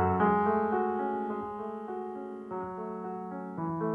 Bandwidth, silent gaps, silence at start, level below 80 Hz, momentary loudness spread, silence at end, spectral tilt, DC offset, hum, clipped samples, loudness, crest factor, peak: 4.6 kHz; none; 0 s; -64 dBFS; 13 LU; 0 s; -10 dB/octave; under 0.1%; none; under 0.1%; -32 LUFS; 16 dB; -14 dBFS